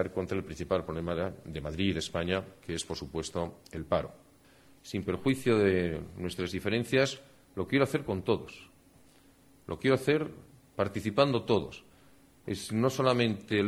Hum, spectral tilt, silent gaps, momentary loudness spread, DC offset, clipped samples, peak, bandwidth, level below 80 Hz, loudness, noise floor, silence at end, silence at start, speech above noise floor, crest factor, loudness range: none; -5.5 dB/octave; none; 16 LU; under 0.1%; under 0.1%; -10 dBFS; 15.5 kHz; -56 dBFS; -31 LUFS; -60 dBFS; 0 s; 0 s; 30 dB; 22 dB; 5 LU